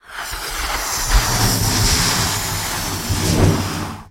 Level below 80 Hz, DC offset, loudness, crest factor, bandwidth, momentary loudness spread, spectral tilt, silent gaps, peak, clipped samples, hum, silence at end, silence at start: -26 dBFS; under 0.1%; -18 LUFS; 18 dB; 16.5 kHz; 9 LU; -3 dB/octave; none; 0 dBFS; under 0.1%; none; 0 s; 0.05 s